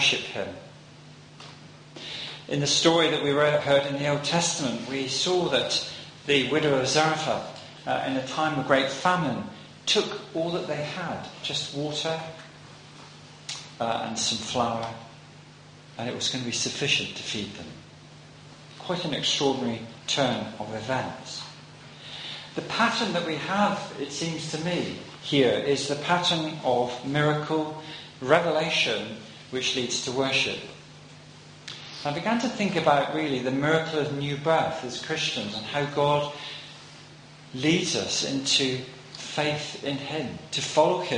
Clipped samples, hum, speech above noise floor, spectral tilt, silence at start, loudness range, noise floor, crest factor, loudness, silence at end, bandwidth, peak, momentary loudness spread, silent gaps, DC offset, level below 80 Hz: under 0.1%; none; 22 dB; -3.5 dB/octave; 0 s; 6 LU; -49 dBFS; 24 dB; -26 LUFS; 0 s; 10.5 kHz; -4 dBFS; 19 LU; none; under 0.1%; -64 dBFS